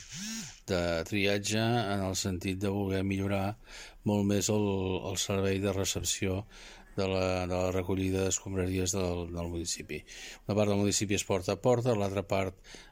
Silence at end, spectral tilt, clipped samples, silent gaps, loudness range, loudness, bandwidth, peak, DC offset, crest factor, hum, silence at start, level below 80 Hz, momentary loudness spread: 0 s; -4.5 dB/octave; under 0.1%; none; 1 LU; -31 LUFS; 16.5 kHz; -14 dBFS; under 0.1%; 18 dB; none; 0 s; -54 dBFS; 10 LU